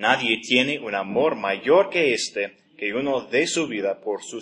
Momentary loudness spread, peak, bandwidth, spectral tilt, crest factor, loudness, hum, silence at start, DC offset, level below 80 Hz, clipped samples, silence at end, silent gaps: 10 LU; -2 dBFS; 11 kHz; -3 dB/octave; 20 dB; -22 LUFS; none; 0 s; under 0.1%; -70 dBFS; under 0.1%; 0 s; none